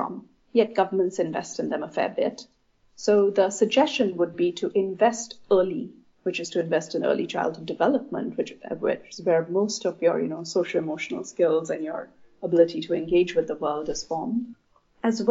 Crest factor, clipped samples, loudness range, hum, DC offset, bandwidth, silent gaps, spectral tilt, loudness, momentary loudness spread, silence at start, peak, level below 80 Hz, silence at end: 18 dB; under 0.1%; 3 LU; none; under 0.1%; 8 kHz; none; -4.5 dB/octave; -25 LUFS; 10 LU; 0 s; -6 dBFS; -62 dBFS; 0 s